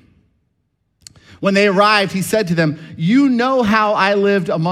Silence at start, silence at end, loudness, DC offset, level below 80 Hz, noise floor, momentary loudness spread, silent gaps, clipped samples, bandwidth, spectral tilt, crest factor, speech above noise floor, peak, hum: 1.4 s; 0 s; -15 LUFS; under 0.1%; -54 dBFS; -67 dBFS; 6 LU; none; under 0.1%; 15.5 kHz; -5.5 dB/octave; 16 dB; 53 dB; 0 dBFS; none